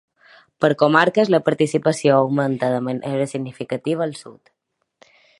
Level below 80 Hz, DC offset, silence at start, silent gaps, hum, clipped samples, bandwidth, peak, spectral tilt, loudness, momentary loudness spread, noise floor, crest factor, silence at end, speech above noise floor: -66 dBFS; under 0.1%; 0.6 s; none; none; under 0.1%; 11.5 kHz; 0 dBFS; -6 dB/octave; -19 LUFS; 11 LU; -62 dBFS; 20 dB; 1.1 s; 43 dB